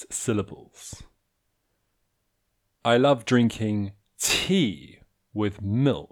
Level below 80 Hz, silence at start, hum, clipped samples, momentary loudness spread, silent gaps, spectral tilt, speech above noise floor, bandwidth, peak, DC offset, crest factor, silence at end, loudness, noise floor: -56 dBFS; 0 s; none; under 0.1%; 21 LU; none; -4.5 dB/octave; 51 dB; 19 kHz; -6 dBFS; under 0.1%; 20 dB; 0.05 s; -24 LUFS; -75 dBFS